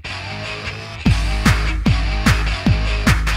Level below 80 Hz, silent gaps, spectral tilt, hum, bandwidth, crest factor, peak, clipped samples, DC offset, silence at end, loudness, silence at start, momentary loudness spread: -20 dBFS; none; -5 dB/octave; none; 15.5 kHz; 16 dB; 0 dBFS; under 0.1%; under 0.1%; 0 s; -19 LUFS; 0.05 s; 9 LU